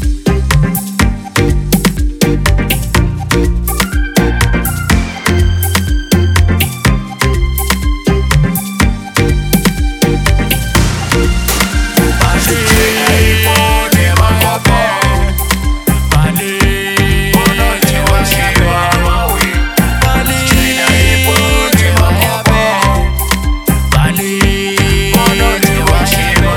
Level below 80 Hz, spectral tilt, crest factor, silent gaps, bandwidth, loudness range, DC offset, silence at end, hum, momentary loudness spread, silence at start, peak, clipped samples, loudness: -16 dBFS; -4.5 dB/octave; 10 dB; none; 19 kHz; 3 LU; under 0.1%; 0 s; none; 5 LU; 0 s; 0 dBFS; under 0.1%; -11 LUFS